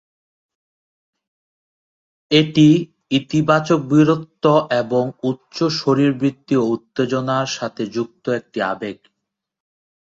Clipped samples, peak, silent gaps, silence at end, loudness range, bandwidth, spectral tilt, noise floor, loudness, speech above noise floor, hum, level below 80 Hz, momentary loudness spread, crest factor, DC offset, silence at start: under 0.1%; -2 dBFS; none; 1.1 s; 6 LU; 7.8 kHz; -6 dB/octave; -79 dBFS; -18 LUFS; 62 dB; none; -60 dBFS; 10 LU; 18 dB; under 0.1%; 2.3 s